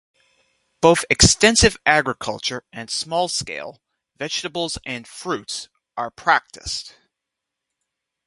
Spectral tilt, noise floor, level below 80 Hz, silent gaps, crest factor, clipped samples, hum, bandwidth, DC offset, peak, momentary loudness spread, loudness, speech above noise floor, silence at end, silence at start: -2.5 dB/octave; -83 dBFS; -38 dBFS; none; 22 dB; under 0.1%; none; 11.5 kHz; under 0.1%; 0 dBFS; 17 LU; -19 LUFS; 62 dB; 1.4 s; 0.8 s